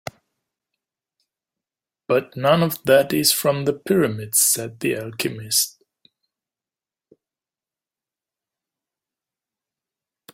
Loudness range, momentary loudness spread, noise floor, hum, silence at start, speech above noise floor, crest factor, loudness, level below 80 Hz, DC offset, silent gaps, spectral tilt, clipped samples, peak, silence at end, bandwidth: 9 LU; 9 LU; under -90 dBFS; none; 2.1 s; over 70 dB; 22 dB; -19 LUFS; -62 dBFS; under 0.1%; none; -3.5 dB/octave; under 0.1%; -2 dBFS; 4.65 s; 16.5 kHz